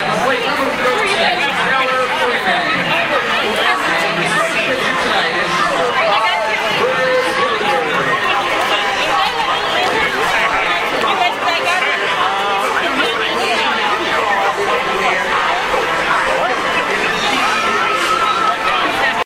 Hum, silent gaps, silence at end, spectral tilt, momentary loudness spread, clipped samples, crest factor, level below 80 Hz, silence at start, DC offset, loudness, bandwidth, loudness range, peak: none; none; 0 s; -2.5 dB/octave; 2 LU; under 0.1%; 14 dB; -46 dBFS; 0 s; under 0.1%; -14 LUFS; 16 kHz; 1 LU; -2 dBFS